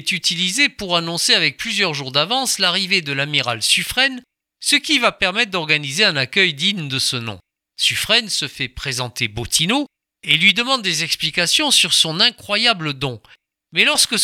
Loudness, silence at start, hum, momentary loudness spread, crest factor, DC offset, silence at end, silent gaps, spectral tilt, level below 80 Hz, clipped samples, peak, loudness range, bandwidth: -16 LUFS; 0 s; none; 10 LU; 18 dB; under 0.1%; 0 s; none; -2 dB/octave; -50 dBFS; under 0.1%; 0 dBFS; 3 LU; 20 kHz